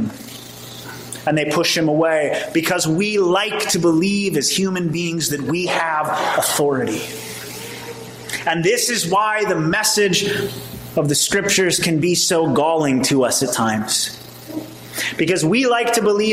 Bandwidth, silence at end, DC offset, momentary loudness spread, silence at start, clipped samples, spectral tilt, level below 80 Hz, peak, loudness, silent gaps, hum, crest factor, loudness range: 16 kHz; 0 s; under 0.1%; 15 LU; 0 s; under 0.1%; -3.5 dB/octave; -54 dBFS; -4 dBFS; -18 LUFS; none; none; 16 dB; 3 LU